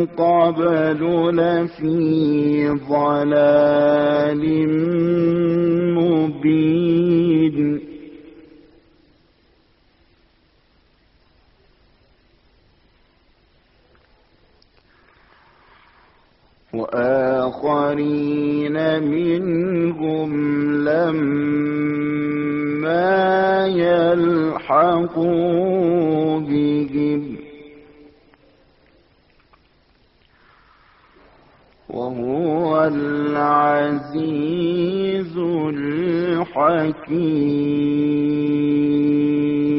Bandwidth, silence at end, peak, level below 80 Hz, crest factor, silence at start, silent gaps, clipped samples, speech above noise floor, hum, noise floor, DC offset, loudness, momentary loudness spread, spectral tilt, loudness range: 5.8 kHz; 0 s; -4 dBFS; -56 dBFS; 16 dB; 0 s; none; under 0.1%; 40 dB; none; -58 dBFS; under 0.1%; -18 LUFS; 6 LU; -6.5 dB/octave; 8 LU